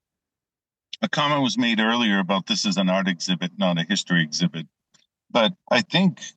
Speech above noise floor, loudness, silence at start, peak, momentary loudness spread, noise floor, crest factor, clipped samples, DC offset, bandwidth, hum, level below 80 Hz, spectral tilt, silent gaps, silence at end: over 68 dB; -22 LUFS; 1 s; -6 dBFS; 6 LU; under -90 dBFS; 18 dB; under 0.1%; under 0.1%; 8.6 kHz; none; -74 dBFS; -4.5 dB/octave; none; 0.05 s